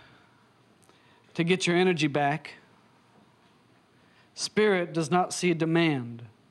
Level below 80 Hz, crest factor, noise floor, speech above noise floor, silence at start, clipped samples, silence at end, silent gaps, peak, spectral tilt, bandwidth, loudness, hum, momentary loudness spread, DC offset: -76 dBFS; 18 dB; -61 dBFS; 35 dB; 1.35 s; under 0.1%; 0.25 s; none; -12 dBFS; -5 dB/octave; 12.5 kHz; -26 LUFS; none; 16 LU; under 0.1%